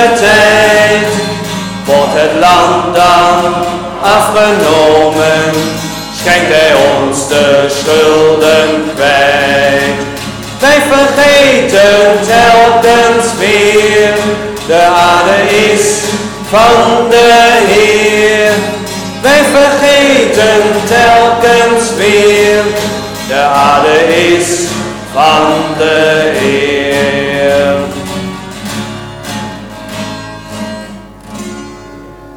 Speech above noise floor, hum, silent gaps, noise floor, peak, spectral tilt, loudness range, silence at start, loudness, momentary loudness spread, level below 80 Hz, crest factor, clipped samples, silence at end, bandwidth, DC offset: 23 dB; none; none; -29 dBFS; 0 dBFS; -3.5 dB/octave; 6 LU; 0 s; -7 LUFS; 14 LU; -36 dBFS; 8 dB; under 0.1%; 0 s; 19 kHz; under 0.1%